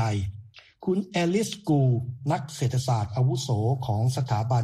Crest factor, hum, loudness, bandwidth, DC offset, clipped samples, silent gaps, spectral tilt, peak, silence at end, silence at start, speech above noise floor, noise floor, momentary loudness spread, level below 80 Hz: 14 dB; none; -26 LUFS; 13.5 kHz; under 0.1%; under 0.1%; none; -6.5 dB/octave; -12 dBFS; 0 s; 0 s; 22 dB; -47 dBFS; 5 LU; -54 dBFS